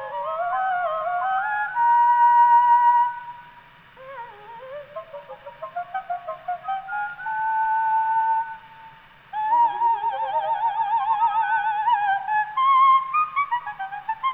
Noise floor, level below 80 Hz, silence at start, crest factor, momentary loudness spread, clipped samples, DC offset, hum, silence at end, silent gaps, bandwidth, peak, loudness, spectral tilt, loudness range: -49 dBFS; -66 dBFS; 0 s; 14 dB; 22 LU; under 0.1%; under 0.1%; none; 0 s; none; 3.9 kHz; -8 dBFS; -21 LUFS; -4.5 dB/octave; 13 LU